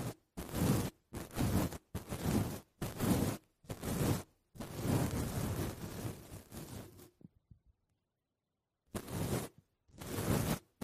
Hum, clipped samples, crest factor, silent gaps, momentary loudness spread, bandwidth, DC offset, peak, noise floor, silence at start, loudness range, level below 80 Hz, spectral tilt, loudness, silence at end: none; under 0.1%; 20 dB; none; 15 LU; 15.5 kHz; under 0.1%; -18 dBFS; -88 dBFS; 0 s; 10 LU; -52 dBFS; -5.5 dB/octave; -38 LUFS; 0.25 s